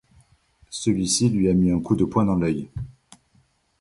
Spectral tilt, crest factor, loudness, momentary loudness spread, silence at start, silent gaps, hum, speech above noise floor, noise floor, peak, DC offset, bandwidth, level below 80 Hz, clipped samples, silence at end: -5.5 dB/octave; 18 dB; -22 LUFS; 16 LU; 0.7 s; none; none; 42 dB; -63 dBFS; -6 dBFS; under 0.1%; 11.5 kHz; -44 dBFS; under 0.1%; 0.9 s